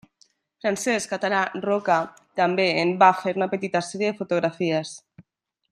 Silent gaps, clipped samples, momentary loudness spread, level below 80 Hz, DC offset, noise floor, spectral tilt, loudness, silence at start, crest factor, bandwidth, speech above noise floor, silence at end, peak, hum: none; under 0.1%; 10 LU; -72 dBFS; under 0.1%; -74 dBFS; -4.5 dB/octave; -23 LUFS; 0.65 s; 22 dB; 14 kHz; 51 dB; 0.5 s; -2 dBFS; none